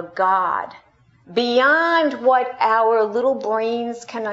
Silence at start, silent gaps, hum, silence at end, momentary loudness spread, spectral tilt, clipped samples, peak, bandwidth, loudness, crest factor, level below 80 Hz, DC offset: 0 s; none; none; 0 s; 11 LU; -4 dB/octave; under 0.1%; -4 dBFS; 8 kHz; -19 LUFS; 16 dB; -70 dBFS; under 0.1%